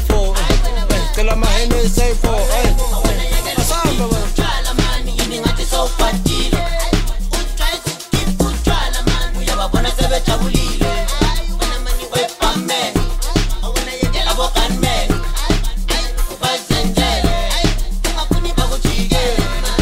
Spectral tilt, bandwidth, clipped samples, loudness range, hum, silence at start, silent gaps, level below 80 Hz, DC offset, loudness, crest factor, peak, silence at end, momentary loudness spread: -4 dB/octave; 16 kHz; under 0.1%; 2 LU; none; 0 s; none; -16 dBFS; under 0.1%; -18 LUFS; 14 dB; 0 dBFS; 0 s; 4 LU